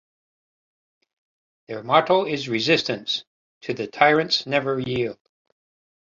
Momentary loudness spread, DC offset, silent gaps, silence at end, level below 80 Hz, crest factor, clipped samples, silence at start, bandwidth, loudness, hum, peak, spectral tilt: 13 LU; under 0.1%; 3.27-3.61 s; 1 s; -62 dBFS; 24 dB; under 0.1%; 1.7 s; 7.6 kHz; -22 LUFS; none; 0 dBFS; -4.5 dB/octave